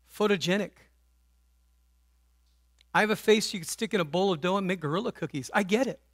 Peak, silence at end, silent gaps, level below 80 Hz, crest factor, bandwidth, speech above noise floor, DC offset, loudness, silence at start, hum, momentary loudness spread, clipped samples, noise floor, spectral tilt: -8 dBFS; 0.2 s; none; -66 dBFS; 22 dB; 16 kHz; 38 dB; under 0.1%; -28 LUFS; 0.15 s; none; 7 LU; under 0.1%; -66 dBFS; -4.5 dB/octave